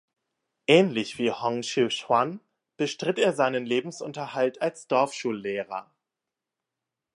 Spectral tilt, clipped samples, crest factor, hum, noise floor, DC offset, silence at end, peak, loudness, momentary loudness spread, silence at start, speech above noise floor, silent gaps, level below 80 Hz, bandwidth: -4.5 dB/octave; under 0.1%; 24 dB; none; -87 dBFS; under 0.1%; 1.35 s; -2 dBFS; -26 LUFS; 12 LU; 0.7 s; 62 dB; none; -76 dBFS; 11.5 kHz